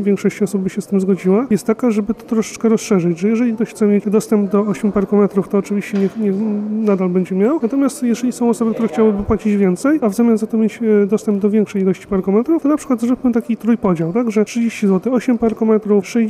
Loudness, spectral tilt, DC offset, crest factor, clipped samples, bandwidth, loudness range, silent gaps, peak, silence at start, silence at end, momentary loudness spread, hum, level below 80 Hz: -16 LUFS; -7.5 dB/octave; under 0.1%; 12 dB; under 0.1%; 14 kHz; 1 LU; none; -4 dBFS; 0 s; 0 s; 4 LU; none; -46 dBFS